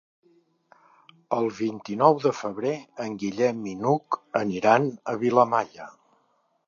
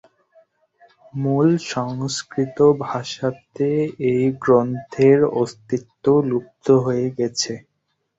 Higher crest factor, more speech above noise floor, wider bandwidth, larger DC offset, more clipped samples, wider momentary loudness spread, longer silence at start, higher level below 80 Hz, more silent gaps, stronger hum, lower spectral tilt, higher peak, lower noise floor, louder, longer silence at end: first, 24 dB vs 18 dB; second, 44 dB vs 53 dB; about the same, 7.4 kHz vs 8 kHz; neither; neither; about the same, 11 LU vs 9 LU; first, 1.3 s vs 1.15 s; second, -70 dBFS vs -58 dBFS; neither; neither; about the same, -6.5 dB/octave vs -6 dB/octave; about the same, -2 dBFS vs -2 dBFS; second, -68 dBFS vs -72 dBFS; second, -25 LUFS vs -20 LUFS; first, 0.75 s vs 0.6 s